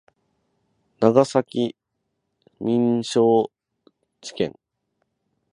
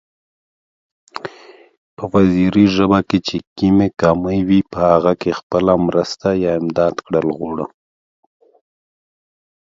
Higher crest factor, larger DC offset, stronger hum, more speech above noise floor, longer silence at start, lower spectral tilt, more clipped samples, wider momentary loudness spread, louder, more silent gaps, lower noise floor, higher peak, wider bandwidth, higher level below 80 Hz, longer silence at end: first, 24 dB vs 18 dB; neither; neither; first, 57 dB vs 28 dB; second, 1 s vs 1.25 s; second, -6 dB/octave vs -7.5 dB/octave; neither; about the same, 13 LU vs 15 LU; second, -21 LUFS vs -16 LUFS; second, none vs 1.78-1.97 s, 3.47-3.56 s, 5.43-5.50 s; first, -77 dBFS vs -43 dBFS; about the same, 0 dBFS vs 0 dBFS; first, 10.5 kHz vs 7.6 kHz; second, -66 dBFS vs -44 dBFS; second, 1 s vs 2.05 s